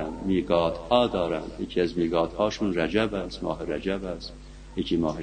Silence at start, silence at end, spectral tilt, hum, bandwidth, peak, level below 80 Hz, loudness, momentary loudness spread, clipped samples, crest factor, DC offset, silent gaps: 0 s; 0 s; -6 dB/octave; none; 9.6 kHz; -4 dBFS; -44 dBFS; -27 LUFS; 10 LU; under 0.1%; 22 dB; under 0.1%; none